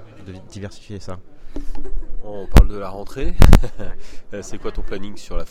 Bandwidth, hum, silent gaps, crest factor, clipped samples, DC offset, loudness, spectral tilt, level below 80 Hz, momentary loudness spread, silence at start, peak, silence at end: 16 kHz; none; none; 16 dB; 0.2%; under 0.1%; -20 LUFS; -6.5 dB/octave; -20 dBFS; 22 LU; 0 s; 0 dBFS; 0 s